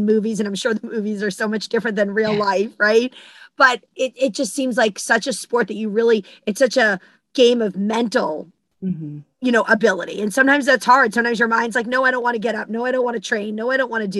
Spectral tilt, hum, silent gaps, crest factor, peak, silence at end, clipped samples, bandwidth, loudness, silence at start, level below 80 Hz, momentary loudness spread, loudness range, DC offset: -4 dB/octave; none; none; 18 dB; 0 dBFS; 0 s; under 0.1%; 12.5 kHz; -19 LUFS; 0 s; -66 dBFS; 10 LU; 3 LU; under 0.1%